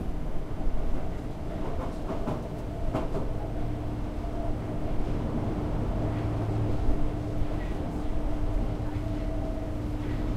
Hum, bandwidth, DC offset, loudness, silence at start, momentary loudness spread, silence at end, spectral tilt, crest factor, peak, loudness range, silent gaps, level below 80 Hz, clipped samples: none; 9.4 kHz; under 0.1%; -33 LUFS; 0 s; 5 LU; 0 s; -8.5 dB/octave; 16 dB; -14 dBFS; 3 LU; none; -32 dBFS; under 0.1%